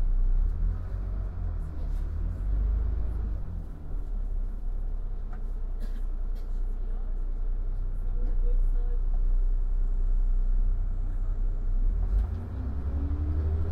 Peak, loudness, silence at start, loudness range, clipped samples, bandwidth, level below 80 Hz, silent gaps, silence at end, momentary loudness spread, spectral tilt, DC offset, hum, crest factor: -16 dBFS; -34 LUFS; 0 s; 5 LU; under 0.1%; 1.9 kHz; -26 dBFS; none; 0 s; 8 LU; -9.5 dB/octave; under 0.1%; none; 10 dB